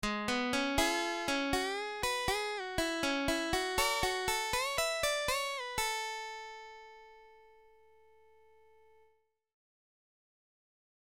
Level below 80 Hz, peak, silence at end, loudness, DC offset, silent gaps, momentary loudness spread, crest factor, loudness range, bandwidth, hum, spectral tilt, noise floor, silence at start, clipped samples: -52 dBFS; -16 dBFS; 3.7 s; -33 LUFS; under 0.1%; none; 11 LU; 20 dB; 10 LU; 16.5 kHz; 50 Hz at -70 dBFS; -2 dB/octave; -73 dBFS; 0 s; under 0.1%